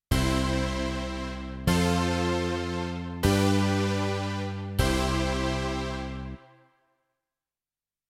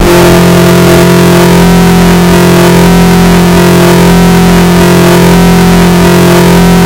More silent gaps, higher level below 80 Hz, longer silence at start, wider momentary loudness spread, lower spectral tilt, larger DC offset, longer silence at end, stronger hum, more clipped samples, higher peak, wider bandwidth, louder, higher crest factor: neither; second, -38 dBFS vs -18 dBFS; about the same, 0.1 s vs 0 s; first, 10 LU vs 1 LU; about the same, -5.5 dB/octave vs -5.5 dB/octave; neither; first, 1.7 s vs 0 s; neither; second, under 0.1% vs 6%; second, -8 dBFS vs 0 dBFS; about the same, 16.5 kHz vs 17 kHz; second, -28 LUFS vs -3 LUFS; first, 20 dB vs 2 dB